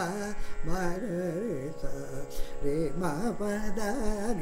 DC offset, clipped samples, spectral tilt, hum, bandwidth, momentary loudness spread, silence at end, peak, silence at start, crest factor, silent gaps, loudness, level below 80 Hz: under 0.1%; under 0.1%; -6 dB/octave; none; 15 kHz; 8 LU; 0 s; -16 dBFS; 0 s; 12 dB; none; -34 LUFS; -38 dBFS